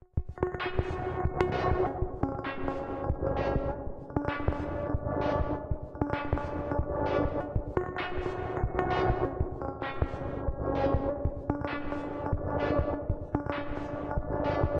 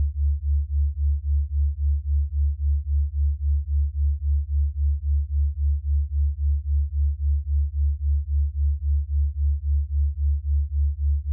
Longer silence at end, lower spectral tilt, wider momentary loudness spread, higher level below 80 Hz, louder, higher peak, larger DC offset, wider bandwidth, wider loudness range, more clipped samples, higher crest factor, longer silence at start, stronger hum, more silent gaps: about the same, 0 s vs 0 s; second, -9 dB/octave vs -28 dB/octave; first, 6 LU vs 2 LU; second, -38 dBFS vs -22 dBFS; second, -32 LUFS vs -25 LUFS; first, -12 dBFS vs -16 dBFS; neither; first, 7 kHz vs 0.1 kHz; about the same, 1 LU vs 0 LU; neither; first, 20 dB vs 6 dB; first, 0.15 s vs 0 s; neither; neither